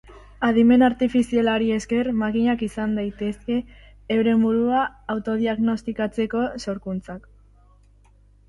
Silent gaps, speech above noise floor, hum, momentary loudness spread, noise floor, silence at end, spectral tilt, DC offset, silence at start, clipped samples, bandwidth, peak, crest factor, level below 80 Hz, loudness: none; 33 dB; 50 Hz at -45 dBFS; 11 LU; -54 dBFS; 1.3 s; -6.5 dB/octave; under 0.1%; 0.1 s; under 0.1%; 11.5 kHz; -6 dBFS; 16 dB; -48 dBFS; -22 LUFS